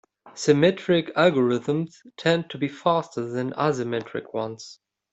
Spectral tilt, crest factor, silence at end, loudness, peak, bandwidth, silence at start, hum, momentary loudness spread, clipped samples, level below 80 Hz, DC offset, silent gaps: -6 dB/octave; 20 dB; 0.4 s; -24 LUFS; -4 dBFS; 8.2 kHz; 0.25 s; none; 12 LU; under 0.1%; -66 dBFS; under 0.1%; none